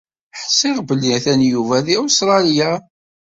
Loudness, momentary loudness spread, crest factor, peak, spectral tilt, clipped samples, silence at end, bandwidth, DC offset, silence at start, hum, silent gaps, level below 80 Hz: -15 LUFS; 8 LU; 14 dB; -2 dBFS; -3.5 dB/octave; under 0.1%; 0.5 s; 7.8 kHz; under 0.1%; 0.35 s; none; none; -58 dBFS